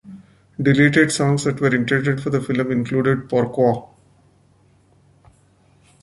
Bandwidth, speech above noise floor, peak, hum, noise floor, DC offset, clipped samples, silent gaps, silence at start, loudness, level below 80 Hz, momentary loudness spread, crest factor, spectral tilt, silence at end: 11.5 kHz; 38 dB; -2 dBFS; none; -56 dBFS; under 0.1%; under 0.1%; none; 0.05 s; -19 LUFS; -54 dBFS; 7 LU; 18 dB; -6 dB/octave; 2.15 s